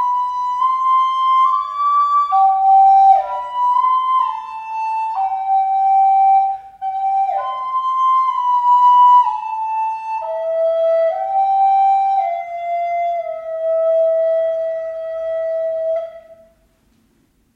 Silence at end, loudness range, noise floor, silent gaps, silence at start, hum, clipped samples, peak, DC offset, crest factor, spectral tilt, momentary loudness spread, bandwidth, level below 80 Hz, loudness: 1.2 s; 6 LU; -59 dBFS; none; 0 s; none; under 0.1%; -2 dBFS; under 0.1%; 14 dB; -2 dB/octave; 12 LU; 7 kHz; -62 dBFS; -16 LUFS